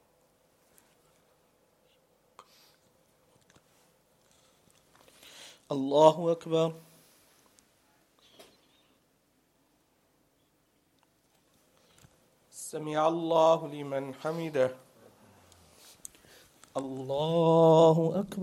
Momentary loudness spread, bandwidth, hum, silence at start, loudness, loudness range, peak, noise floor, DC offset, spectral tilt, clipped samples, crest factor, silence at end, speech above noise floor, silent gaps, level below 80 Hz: 27 LU; 14.5 kHz; none; 5.4 s; -27 LUFS; 10 LU; -6 dBFS; -71 dBFS; under 0.1%; -6.5 dB/octave; under 0.1%; 26 dB; 0 s; 45 dB; none; -76 dBFS